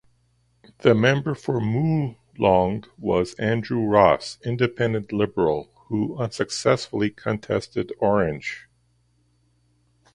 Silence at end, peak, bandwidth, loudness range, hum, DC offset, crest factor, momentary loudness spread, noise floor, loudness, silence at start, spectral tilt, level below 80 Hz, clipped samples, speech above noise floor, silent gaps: 1.55 s; -2 dBFS; 11.5 kHz; 4 LU; 60 Hz at -45 dBFS; under 0.1%; 22 dB; 11 LU; -65 dBFS; -23 LUFS; 0.85 s; -6.5 dB/octave; -50 dBFS; under 0.1%; 43 dB; none